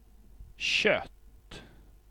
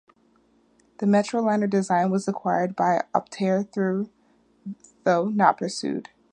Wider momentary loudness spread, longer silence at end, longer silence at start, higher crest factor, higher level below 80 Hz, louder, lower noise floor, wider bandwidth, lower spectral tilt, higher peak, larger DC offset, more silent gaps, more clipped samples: first, 24 LU vs 13 LU; first, 0.45 s vs 0.3 s; second, 0.4 s vs 1 s; about the same, 24 dB vs 22 dB; first, -54 dBFS vs -72 dBFS; second, -27 LUFS vs -24 LUFS; second, -54 dBFS vs -62 dBFS; first, 18.5 kHz vs 9.8 kHz; second, -2.5 dB/octave vs -6.5 dB/octave; second, -10 dBFS vs -4 dBFS; neither; neither; neither